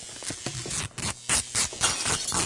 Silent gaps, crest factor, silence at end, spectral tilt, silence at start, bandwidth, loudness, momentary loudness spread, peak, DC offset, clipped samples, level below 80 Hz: none; 22 dB; 0 s; -1 dB/octave; 0 s; 11.5 kHz; -26 LUFS; 10 LU; -8 dBFS; under 0.1%; under 0.1%; -50 dBFS